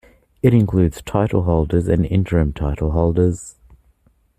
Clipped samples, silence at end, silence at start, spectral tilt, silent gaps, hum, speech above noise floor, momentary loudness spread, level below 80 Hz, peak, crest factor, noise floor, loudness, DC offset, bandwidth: under 0.1%; 0.9 s; 0.45 s; -8.5 dB/octave; none; none; 41 dB; 6 LU; -32 dBFS; -2 dBFS; 16 dB; -58 dBFS; -18 LUFS; under 0.1%; 13.5 kHz